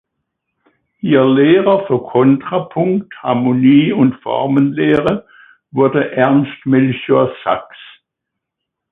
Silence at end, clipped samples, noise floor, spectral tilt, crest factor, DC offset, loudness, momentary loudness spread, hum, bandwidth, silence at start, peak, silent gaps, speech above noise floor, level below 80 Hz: 1.05 s; under 0.1%; -79 dBFS; -9.5 dB/octave; 14 dB; under 0.1%; -14 LUFS; 9 LU; none; 3.9 kHz; 1.05 s; 0 dBFS; none; 66 dB; -54 dBFS